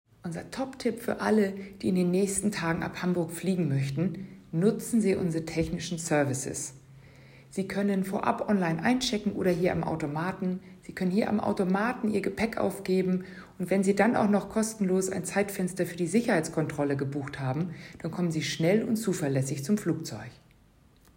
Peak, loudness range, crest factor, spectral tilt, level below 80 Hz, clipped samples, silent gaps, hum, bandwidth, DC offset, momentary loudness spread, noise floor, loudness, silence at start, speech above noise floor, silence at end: -10 dBFS; 2 LU; 18 dB; -5.5 dB/octave; -58 dBFS; under 0.1%; none; none; 16.5 kHz; under 0.1%; 9 LU; -60 dBFS; -29 LUFS; 0.25 s; 32 dB; 0.8 s